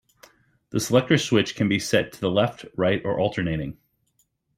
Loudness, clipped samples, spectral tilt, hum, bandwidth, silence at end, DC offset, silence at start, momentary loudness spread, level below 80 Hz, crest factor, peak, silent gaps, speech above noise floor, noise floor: -23 LUFS; under 0.1%; -5 dB/octave; none; 16 kHz; 0.85 s; under 0.1%; 0.75 s; 8 LU; -54 dBFS; 20 dB; -4 dBFS; none; 46 dB; -69 dBFS